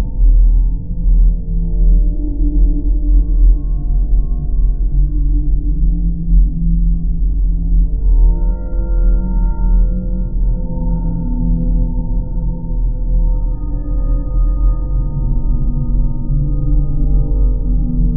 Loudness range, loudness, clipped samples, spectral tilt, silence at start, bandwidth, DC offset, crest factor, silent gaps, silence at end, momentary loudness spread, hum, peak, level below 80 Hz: 3 LU; -18 LUFS; under 0.1%; -15.5 dB/octave; 0 s; 1.5 kHz; 4%; 12 dB; none; 0 s; 6 LU; none; 0 dBFS; -12 dBFS